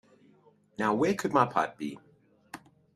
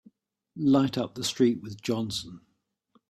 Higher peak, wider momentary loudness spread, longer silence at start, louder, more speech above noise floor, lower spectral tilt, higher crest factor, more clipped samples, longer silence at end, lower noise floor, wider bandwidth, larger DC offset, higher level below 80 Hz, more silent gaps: about the same, -8 dBFS vs -10 dBFS; first, 22 LU vs 12 LU; first, 0.8 s vs 0.55 s; about the same, -29 LUFS vs -27 LUFS; second, 35 dB vs 42 dB; about the same, -6 dB/octave vs -5.5 dB/octave; first, 24 dB vs 18 dB; neither; second, 0.4 s vs 0.75 s; second, -62 dBFS vs -68 dBFS; about the same, 14 kHz vs 14.5 kHz; neither; second, -70 dBFS vs -64 dBFS; neither